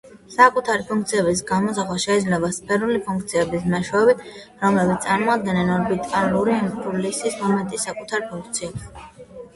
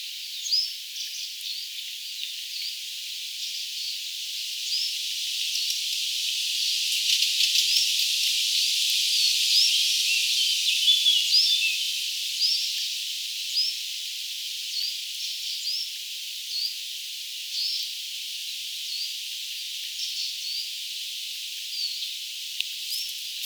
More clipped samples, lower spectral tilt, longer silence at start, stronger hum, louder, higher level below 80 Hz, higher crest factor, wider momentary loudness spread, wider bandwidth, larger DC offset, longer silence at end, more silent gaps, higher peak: neither; first, -5 dB/octave vs 14 dB/octave; about the same, 0.05 s vs 0 s; neither; first, -21 LUFS vs -24 LUFS; first, -52 dBFS vs under -90 dBFS; about the same, 20 dB vs 22 dB; about the same, 10 LU vs 12 LU; second, 11.5 kHz vs over 20 kHz; neither; about the same, 0.1 s vs 0 s; neither; first, 0 dBFS vs -6 dBFS